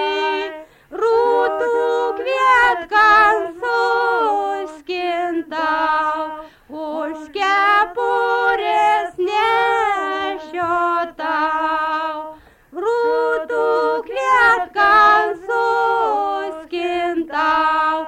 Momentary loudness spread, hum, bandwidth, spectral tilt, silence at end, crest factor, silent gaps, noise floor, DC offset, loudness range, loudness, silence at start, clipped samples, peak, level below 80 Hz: 12 LU; none; 15.5 kHz; -3 dB/octave; 0 s; 14 dB; none; -39 dBFS; under 0.1%; 5 LU; -17 LUFS; 0 s; under 0.1%; -4 dBFS; -52 dBFS